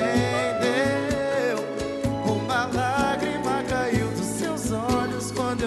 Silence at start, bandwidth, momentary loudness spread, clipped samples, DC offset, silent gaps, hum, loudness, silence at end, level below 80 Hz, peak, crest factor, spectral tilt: 0 s; 13 kHz; 4 LU; under 0.1%; under 0.1%; none; none; -25 LUFS; 0 s; -44 dBFS; -10 dBFS; 16 dB; -5 dB/octave